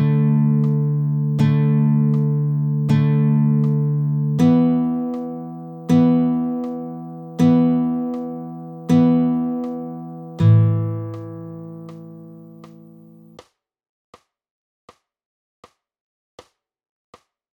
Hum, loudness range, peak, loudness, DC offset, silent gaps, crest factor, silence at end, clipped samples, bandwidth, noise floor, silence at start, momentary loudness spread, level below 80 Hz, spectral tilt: none; 5 LU; -4 dBFS; -18 LUFS; under 0.1%; none; 16 dB; 4.85 s; under 0.1%; 6.4 kHz; -50 dBFS; 0 s; 18 LU; -60 dBFS; -10 dB/octave